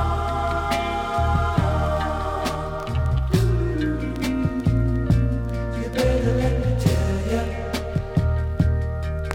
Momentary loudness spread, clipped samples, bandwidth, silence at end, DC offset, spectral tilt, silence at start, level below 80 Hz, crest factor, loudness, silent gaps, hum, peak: 6 LU; under 0.1%; 16.5 kHz; 0 s; under 0.1%; -7 dB/octave; 0 s; -28 dBFS; 16 dB; -23 LUFS; none; none; -4 dBFS